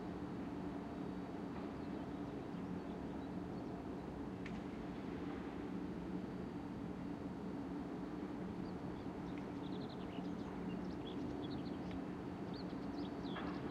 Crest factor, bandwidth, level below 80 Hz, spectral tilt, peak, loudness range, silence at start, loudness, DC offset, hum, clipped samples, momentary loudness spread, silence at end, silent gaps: 14 dB; 12 kHz; -62 dBFS; -7.5 dB/octave; -32 dBFS; 1 LU; 0 s; -46 LUFS; under 0.1%; none; under 0.1%; 2 LU; 0 s; none